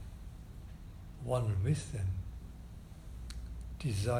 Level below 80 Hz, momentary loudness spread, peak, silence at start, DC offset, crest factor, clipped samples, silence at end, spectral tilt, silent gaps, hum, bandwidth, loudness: -48 dBFS; 17 LU; -20 dBFS; 0 s; under 0.1%; 18 dB; under 0.1%; 0 s; -6.5 dB/octave; none; none; 14 kHz; -38 LUFS